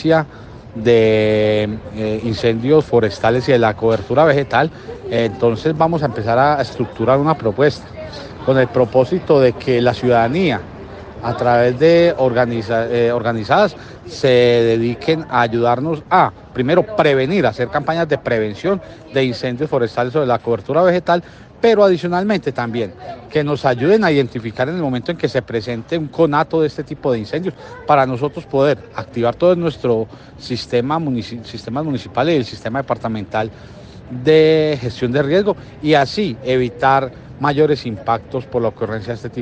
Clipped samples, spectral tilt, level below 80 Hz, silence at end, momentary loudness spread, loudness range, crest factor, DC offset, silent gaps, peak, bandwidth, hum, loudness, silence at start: under 0.1%; -7 dB/octave; -46 dBFS; 0 s; 10 LU; 3 LU; 16 dB; under 0.1%; none; 0 dBFS; 8.6 kHz; none; -16 LUFS; 0 s